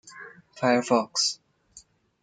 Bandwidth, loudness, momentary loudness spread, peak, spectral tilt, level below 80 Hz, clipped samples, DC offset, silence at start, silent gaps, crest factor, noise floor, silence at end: 9.6 kHz; -24 LUFS; 22 LU; -8 dBFS; -3 dB/octave; -74 dBFS; under 0.1%; under 0.1%; 0.05 s; none; 20 dB; -55 dBFS; 0.45 s